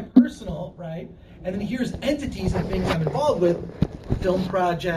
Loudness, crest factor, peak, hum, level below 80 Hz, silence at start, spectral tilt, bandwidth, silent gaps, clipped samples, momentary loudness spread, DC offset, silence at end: -24 LUFS; 22 dB; -2 dBFS; none; -38 dBFS; 0 s; -7 dB/octave; 13.5 kHz; none; under 0.1%; 13 LU; under 0.1%; 0 s